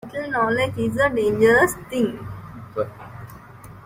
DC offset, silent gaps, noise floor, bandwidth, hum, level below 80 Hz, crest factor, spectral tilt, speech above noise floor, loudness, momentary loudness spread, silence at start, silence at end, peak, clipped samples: under 0.1%; none; -42 dBFS; 16 kHz; none; -50 dBFS; 18 dB; -5.5 dB/octave; 22 dB; -21 LUFS; 23 LU; 0.05 s; 0 s; -4 dBFS; under 0.1%